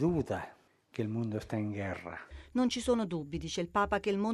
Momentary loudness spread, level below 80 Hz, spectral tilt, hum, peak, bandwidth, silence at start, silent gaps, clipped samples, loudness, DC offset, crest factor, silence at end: 12 LU; -54 dBFS; -6 dB/octave; none; -16 dBFS; 12.5 kHz; 0 s; none; under 0.1%; -34 LUFS; under 0.1%; 16 dB; 0 s